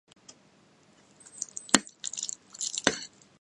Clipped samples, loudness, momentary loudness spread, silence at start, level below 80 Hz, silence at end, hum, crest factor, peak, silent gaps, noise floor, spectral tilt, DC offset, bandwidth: under 0.1%; -30 LUFS; 14 LU; 1.35 s; -68 dBFS; 0.35 s; none; 34 dB; 0 dBFS; none; -62 dBFS; -1 dB/octave; under 0.1%; 16 kHz